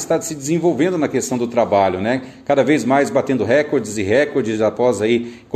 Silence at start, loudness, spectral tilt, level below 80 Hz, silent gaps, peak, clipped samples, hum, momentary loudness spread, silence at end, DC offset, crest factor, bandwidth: 0 s; -17 LUFS; -5.5 dB/octave; -50 dBFS; none; -2 dBFS; under 0.1%; none; 5 LU; 0 s; under 0.1%; 14 dB; 14 kHz